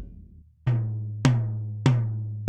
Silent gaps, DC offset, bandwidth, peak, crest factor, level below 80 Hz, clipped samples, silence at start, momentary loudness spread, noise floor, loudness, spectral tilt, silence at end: none; under 0.1%; 9 kHz; -6 dBFS; 20 dB; -48 dBFS; under 0.1%; 0 s; 8 LU; -49 dBFS; -26 LUFS; -7 dB/octave; 0 s